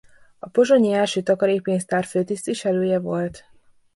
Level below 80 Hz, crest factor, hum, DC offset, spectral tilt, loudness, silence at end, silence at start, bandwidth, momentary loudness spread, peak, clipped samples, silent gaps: -62 dBFS; 16 dB; none; under 0.1%; -5.5 dB/octave; -21 LUFS; 0.55 s; 0.45 s; 11.5 kHz; 9 LU; -6 dBFS; under 0.1%; none